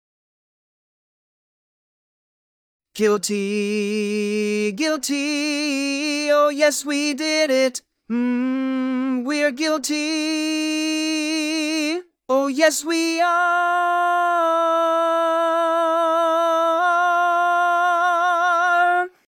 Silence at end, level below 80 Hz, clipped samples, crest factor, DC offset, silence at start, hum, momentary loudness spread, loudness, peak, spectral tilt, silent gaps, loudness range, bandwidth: 0.25 s; -78 dBFS; under 0.1%; 18 dB; under 0.1%; 2.95 s; none; 5 LU; -20 LUFS; -2 dBFS; -3 dB/octave; none; 6 LU; 19 kHz